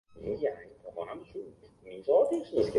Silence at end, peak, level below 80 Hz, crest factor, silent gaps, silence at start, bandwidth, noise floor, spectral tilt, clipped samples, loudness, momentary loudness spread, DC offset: 0 s; -14 dBFS; -60 dBFS; 18 dB; none; 0.15 s; 11.5 kHz; -51 dBFS; -7 dB/octave; under 0.1%; -31 LUFS; 20 LU; under 0.1%